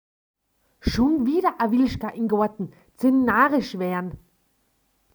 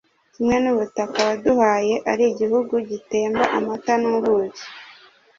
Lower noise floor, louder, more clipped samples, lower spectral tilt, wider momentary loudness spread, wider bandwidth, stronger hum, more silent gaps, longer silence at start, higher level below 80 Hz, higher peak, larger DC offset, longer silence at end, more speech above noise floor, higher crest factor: first, -68 dBFS vs -49 dBFS; about the same, -22 LUFS vs -20 LUFS; neither; first, -6.5 dB/octave vs -4.5 dB/octave; first, 12 LU vs 7 LU; first, over 20 kHz vs 7.8 kHz; neither; neither; first, 0.85 s vs 0.4 s; first, -44 dBFS vs -56 dBFS; second, -6 dBFS vs -2 dBFS; neither; first, 0.95 s vs 0.45 s; first, 46 dB vs 29 dB; about the same, 18 dB vs 18 dB